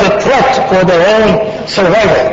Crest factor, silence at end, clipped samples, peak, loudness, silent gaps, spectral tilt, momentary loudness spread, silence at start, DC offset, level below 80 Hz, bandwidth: 8 dB; 0 s; under 0.1%; 0 dBFS; -9 LUFS; none; -5 dB/octave; 5 LU; 0 s; under 0.1%; -34 dBFS; 8 kHz